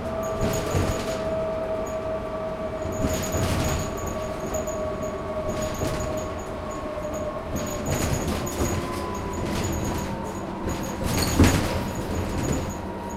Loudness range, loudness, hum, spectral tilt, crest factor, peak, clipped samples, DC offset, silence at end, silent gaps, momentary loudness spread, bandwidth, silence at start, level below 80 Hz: 4 LU; -27 LUFS; none; -5 dB/octave; 22 dB; -6 dBFS; under 0.1%; under 0.1%; 0 s; none; 6 LU; 16 kHz; 0 s; -36 dBFS